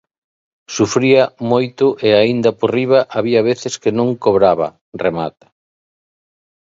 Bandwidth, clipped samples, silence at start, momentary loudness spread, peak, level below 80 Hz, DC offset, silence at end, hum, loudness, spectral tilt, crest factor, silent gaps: 8 kHz; under 0.1%; 0.7 s; 8 LU; 0 dBFS; -54 dBFS; under 0.1%; 1.45 s; none; -15 LUFS; -5.5 dB/octave; 16 dB; 4.81-4.92 s